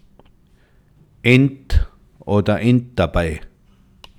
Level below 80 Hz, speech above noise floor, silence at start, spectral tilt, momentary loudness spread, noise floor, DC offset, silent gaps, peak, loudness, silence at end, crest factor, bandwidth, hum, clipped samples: -28 dBFS; 37 dB; 1.25 s; -7.5 dB/octave; 16 LU; -53 dBFS; under 0.1%; none; 0 dBFS; -18 LUFS; 0.7 s; 20 dB; 12.5 kHz; none; under 0.1%